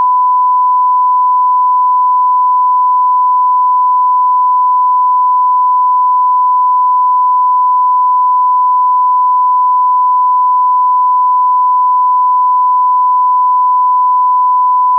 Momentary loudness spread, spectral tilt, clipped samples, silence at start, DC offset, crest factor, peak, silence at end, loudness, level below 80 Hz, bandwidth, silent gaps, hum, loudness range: 0 LU; 1.5 dB/octave; under 0.1%; 0 s; under 0.1%; 4 dB; -6 dBFS; 0 s; -9 LUFS; under -90 dBFS; 1.1 kHz; none; none; 0 LU